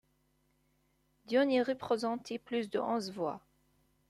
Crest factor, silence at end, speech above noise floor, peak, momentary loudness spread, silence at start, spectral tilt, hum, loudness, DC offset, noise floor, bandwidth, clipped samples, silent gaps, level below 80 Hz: 18 dB; 0.7 s; 41 dB; -18 dBFS; 10 LU; 1.3 s; -5 dB/octave; none; -34 LUFS; under 0.1%; -74 dBFS; 13 kHz; under 0.1%; none; -76 dBFS